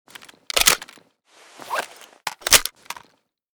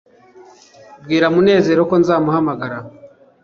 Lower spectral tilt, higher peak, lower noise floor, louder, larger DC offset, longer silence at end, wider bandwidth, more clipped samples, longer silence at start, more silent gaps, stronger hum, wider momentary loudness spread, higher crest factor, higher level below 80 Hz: second, 1 dB/octave vs -7 dB/octave; about the same, 0 dBFS vs -2 dBFS; first, -62 dBFS vs -44 dBFS; second, -19 LUFS vs -15 LUFS; neither; first, 0.65 s vs 0.4 s; first, over 20 kHz vs 7 kHz; neither; second, 0.55 s vs 0.9 s; neither; neither; first, 22 LU vs 13 LU; first, 24 dB vs 16 dB; first, -46 dBFS vs -56 dBFS